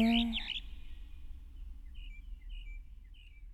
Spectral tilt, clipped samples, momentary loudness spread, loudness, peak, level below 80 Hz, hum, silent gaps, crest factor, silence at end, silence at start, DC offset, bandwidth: -5.5 dB/octave; under 0.1%; 23 LU; -36 LUFS; -18 dBFS; -46 dBFS; none; none; 20 dB; 0 s; 0 s; under 0.1%; 12.5 kHz